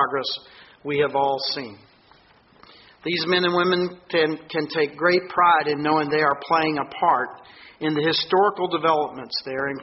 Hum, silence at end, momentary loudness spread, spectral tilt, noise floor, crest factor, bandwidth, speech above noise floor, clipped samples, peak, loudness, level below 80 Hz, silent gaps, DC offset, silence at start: none; 0 s; 10 LU; -2 dB/octave; -55 dBFS; 18 dB; 6 kHz; 33 dB; under 0.1%; -6 dBFS; -22 LUFS; -64 dBFS; none; under 0.1%; 0 s